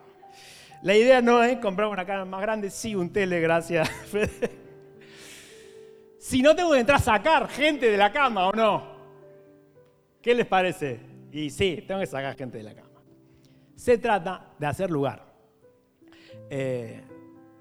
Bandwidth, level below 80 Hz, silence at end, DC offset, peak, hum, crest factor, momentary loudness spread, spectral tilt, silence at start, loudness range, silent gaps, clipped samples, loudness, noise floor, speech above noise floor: 15.5 kHz; -52 dBFS; 0.4 s; under 0.1%; -6 dBFS; none; 20 dB; 18 LU; -5 dB/octave; 0.45 s; 8 LU; none; under 0.1%; -24 LUFS; -60 dBFS; 36 dB